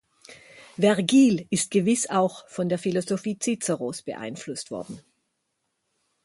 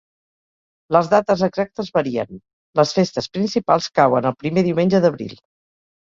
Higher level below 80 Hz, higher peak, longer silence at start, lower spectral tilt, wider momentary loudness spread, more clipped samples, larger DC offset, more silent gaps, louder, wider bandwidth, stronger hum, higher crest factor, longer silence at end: second, -68 dBFS vs -56 dBFS; second, -6 dBFS vs -2 dBFS; second, 0.3 s vs 0.9 s; second, -4.5 dB/octave vs -6 dB/octave; first, 16 LU vs 9 LU; neither; neither; second, none vs 2.53-2.73 s; second, -24 LUFS vs -19 LUFS; first, 11.5 kHz vs 7.6 kHz; neither; about the same, 20 dB vs 18 dB; first, 1.25 s vs 0.75 s